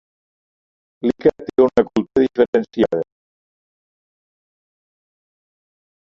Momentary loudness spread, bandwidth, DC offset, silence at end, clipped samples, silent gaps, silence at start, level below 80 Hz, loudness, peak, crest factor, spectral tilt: 8 LU; 7.2 kHz; under 0.1%; 3.1 s; under 0.1%; 2.48-2.53 s; 1.05 s; -56 dBFS; -18 LUFS; -2 dBFS; 20 dB; -7.5 dB/octave